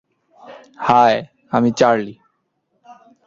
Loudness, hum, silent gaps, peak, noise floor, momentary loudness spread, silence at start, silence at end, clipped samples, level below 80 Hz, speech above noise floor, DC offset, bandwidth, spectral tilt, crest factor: -16 LUFS; none; none; -2 dBFS; -69 dBFS; 10 LU; 0.5 s; 0.35 s; under 0.1%; -58 dBFS; 54 dB; under 0.1%; 7.6 kHz; -5.5 dB/octave; 18 dB